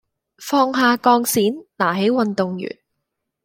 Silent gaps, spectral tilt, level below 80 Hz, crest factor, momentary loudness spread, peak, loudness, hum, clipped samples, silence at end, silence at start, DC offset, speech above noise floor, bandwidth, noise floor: none; -4 dB/octave; -64 dBFS; 18 dB; 11 LU; -2 dBFS; -18 LUFS; none; under 0.1%; 0.75 s; 0.4 s; under 0.1%; 60 dB; 17 kHz; -78 dBFS